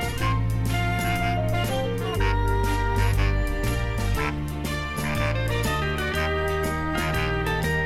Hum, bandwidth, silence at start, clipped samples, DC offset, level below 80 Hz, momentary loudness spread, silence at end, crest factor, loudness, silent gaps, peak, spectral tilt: none; 16 kHz; 0 s; under 0.1%; under 0.1%; -30 dBFS; 3 LU; 0 s; 14 dB; -25 LUFS; none; -10 dBFS; -5.5 dB/octave